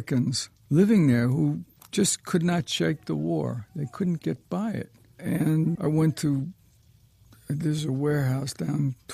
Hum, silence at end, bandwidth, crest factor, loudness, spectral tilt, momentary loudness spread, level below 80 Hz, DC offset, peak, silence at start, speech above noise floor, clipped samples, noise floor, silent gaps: none; 0 s; 15 kHz; 16 dB; -26 LUFS; -6 dB/octave; 10 LU; -60 dBFS; under 0.1%; -10 dBFS; 0 s; 33 dB; under 0.1%; -58 dBFS; none